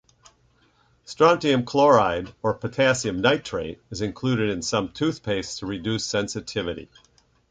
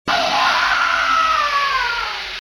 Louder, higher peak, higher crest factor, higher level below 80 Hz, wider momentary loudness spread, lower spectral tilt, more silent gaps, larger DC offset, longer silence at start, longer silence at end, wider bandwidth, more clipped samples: second, -23 LUFS vs -16 LUFS; about the same, -4 dBFS vs -4 dBFS; first, 20 dB vs 14 dB; second, -52 dBFS vs -46 dBFS; first, 13 LU vs 5 LU; first, -4.5 dB/octave vs -1 dB/octave; neither; neither; first, 1.1 s vs 0.05 s; first, 0.65 s vs 0.1 s; second, 9.6 kHz vs 19 kHz; neither